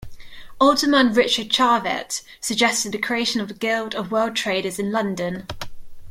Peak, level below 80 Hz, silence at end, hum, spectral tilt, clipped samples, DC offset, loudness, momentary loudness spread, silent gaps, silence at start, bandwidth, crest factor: -4 dBFS; -48 dBFS; 0 s; none; -3 dB/octave; under 0.1%; under 0.1%; -20 LUFS; 12 LU; none; 0 s; 16.5 kHz; 18 dB